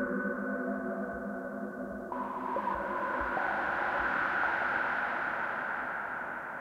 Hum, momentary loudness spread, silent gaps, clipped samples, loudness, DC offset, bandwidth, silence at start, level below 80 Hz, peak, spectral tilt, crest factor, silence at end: none; 9 LU; none; under 0.1%; -33 LUFS; under 0.1%; 16 kHz; 0 s; -60 dBFS; -18 dBFS; -6.5 dB/octave; 16 dB; 0 s